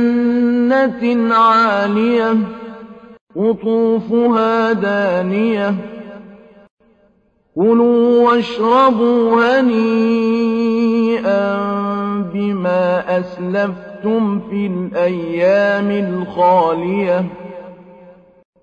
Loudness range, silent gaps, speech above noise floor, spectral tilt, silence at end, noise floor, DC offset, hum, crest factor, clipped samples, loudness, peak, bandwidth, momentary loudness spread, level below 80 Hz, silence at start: 5 LU; 3.21-3.27 s, 6.71-6.77 s; 43 dB; -7.5 dB/octave; 0.5 s; -57 dBFS; under 0.1%; none; 14 dB; under 0.1%; -15 LUFS; -2 dBFS; 7.2 kHz; 9 LU; -56 dBFS; 0 s